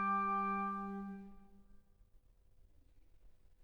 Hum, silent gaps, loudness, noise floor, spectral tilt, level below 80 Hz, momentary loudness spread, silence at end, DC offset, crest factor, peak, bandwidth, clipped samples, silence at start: none; none; -39 LUFS; -66 dBFS; -8.5 dB/octave; -66 dBFS; 17 LU; 0.3 s; under 0.1%; 16 dB; -26 dBFS; 6.2 kHz; under 0.1%; 0 s